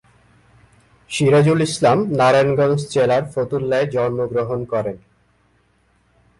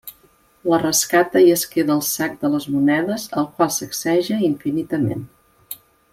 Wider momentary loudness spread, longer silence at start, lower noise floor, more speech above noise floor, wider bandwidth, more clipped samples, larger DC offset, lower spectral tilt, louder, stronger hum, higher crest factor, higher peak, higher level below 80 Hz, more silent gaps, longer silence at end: second, 9 LU vs 16 LU; first, 1.1 s vs 0.05 s; first, -60 dBFS vs -56 dBFS; first, 43 dB vs 37 dB; second, 11.5 kHz vs 16.5 kHz; neither; neither; first, -6 dB/octave vs -4 dB/octave; about the same, -18 LUFS vs -19 LUFS; first, 60 Hz at -50 dBFS vs none; about the same, 14 dB vs 16 dB; about the same, -4 dBFS vs -4 dBFS; about the same, -54 dBFS vs -58 dBFS; neither; first, 1.4 s vs 0.4 s